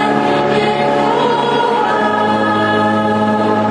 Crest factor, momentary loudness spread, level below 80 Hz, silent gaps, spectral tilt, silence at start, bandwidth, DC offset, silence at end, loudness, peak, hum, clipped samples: 12 dB; 1 LU; -50 dBFS; none; -6 dB/octave; 0 s; 11 kHz; under 0.1%; 0 s; -13 LUFS; 0 dBFS; none; under 0.1%